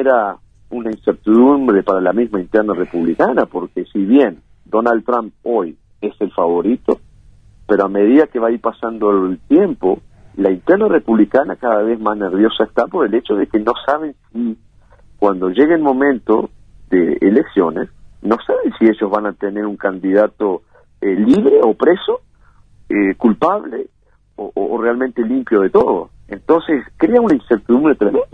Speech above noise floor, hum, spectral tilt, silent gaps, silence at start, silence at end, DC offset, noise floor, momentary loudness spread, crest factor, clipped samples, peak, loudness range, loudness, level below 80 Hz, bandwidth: 34 dB; none; -8 dB/octave; none; 0 s; 0.1 s; 0.1%; -48 dBFS; 11 LU; 14 dB; under 0.1%; 0 dBFS; 3 LU; -15 LUFS; -48 dBFS; 5.4 kHz